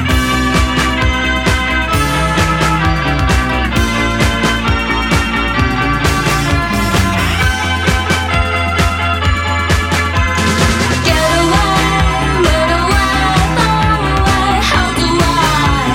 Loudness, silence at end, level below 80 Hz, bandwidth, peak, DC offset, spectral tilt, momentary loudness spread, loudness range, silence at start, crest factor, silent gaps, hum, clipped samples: -13 LUFS; 0 s; -20 dBFS; 17 kHz; 0 dBFS; under 0.1%; -4.5 dB/octave; 2 LU; 2 LU; 0 s; 12 dB; none; none; under 0.1%